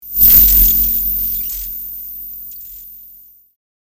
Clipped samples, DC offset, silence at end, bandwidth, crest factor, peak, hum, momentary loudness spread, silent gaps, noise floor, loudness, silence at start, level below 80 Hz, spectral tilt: under 0.1%; under 0.1%; 0.85 s; over 20 kHz; 16 dB; 0 dBFS; none; 24 LU; none; -43 dBFS; -9 LUFS; 0.05 s; -28 dBFS; -2.5 dB/octave